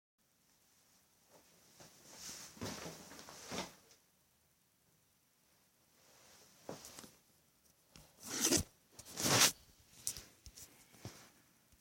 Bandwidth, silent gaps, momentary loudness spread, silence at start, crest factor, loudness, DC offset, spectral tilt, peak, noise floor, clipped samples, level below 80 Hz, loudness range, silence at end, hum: 16.5 kHz; none; 26 LU; 1.35 s; 32 dB; -36 LUFS; under 0.1%; -1.5 dB/octave; -12 dBFS; -75 dBFS; under 0.1%; -68 dBFS; 23 LU; 0.55 s; none